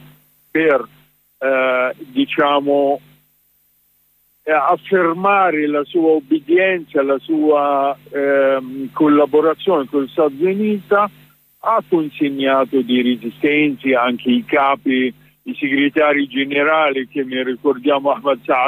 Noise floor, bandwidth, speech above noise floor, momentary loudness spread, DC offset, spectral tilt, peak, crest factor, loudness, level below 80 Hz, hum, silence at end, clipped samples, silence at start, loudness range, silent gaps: -59 dBFS; 15.5 kHz; 43 dB; 7 LU; under 0.1%; -7 dB/octave; -4 dBFS; 12 dB; -16 LUFS; -66 dBFS; none; 0 s; under 0.1%; 0.55 s; 3 LU; none